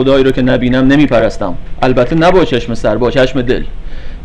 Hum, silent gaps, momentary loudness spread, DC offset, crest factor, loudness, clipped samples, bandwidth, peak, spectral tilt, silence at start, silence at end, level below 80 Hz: none; none; 12 LU; under 0.1%; 10 dB; -11 LUFS; under 0.1%; 9.4 kHz; 0 dBFS; -7 dB/octave; 0 s; 0 s; -22 dBFS